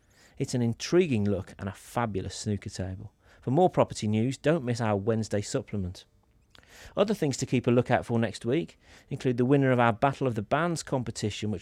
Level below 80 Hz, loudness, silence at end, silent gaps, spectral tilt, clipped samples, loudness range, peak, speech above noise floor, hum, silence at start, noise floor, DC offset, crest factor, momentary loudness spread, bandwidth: -60 dBFS; -28 LUFS; 0 s; none; -6 dB/octave; under 0.1%; 4 LU; -8 dBFS; 32 dB; none; 0.4 s; -60 dBFS; under 0.1%; 20 dB; 13 LU; 14 kHz